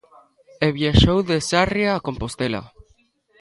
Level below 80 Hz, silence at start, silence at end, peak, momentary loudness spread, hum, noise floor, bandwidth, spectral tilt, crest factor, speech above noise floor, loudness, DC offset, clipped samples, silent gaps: -32 dBFS; 0.6 s; 0.75 s; 0 dBFS; 10 LU; none; -61 dBFS; 11.5 kHz; -5.5 dB/octave; 20 dB; 41 dB; -20 LUFS; under 0.1%; under 0.1%; none